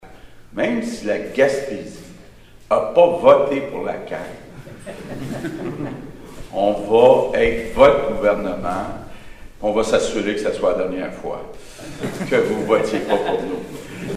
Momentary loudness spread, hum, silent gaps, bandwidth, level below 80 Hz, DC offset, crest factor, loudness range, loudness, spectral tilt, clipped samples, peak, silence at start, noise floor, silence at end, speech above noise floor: 22 LU; none; none; 14 kHz; -42 dBFS; under 0.1%; 20 dB; 6 LU; -19 LUFS; -5.5 dB/octave; under 0.1%; 0 dBFS; 0.05 s; -43 dBFS; 0 s; 24 dB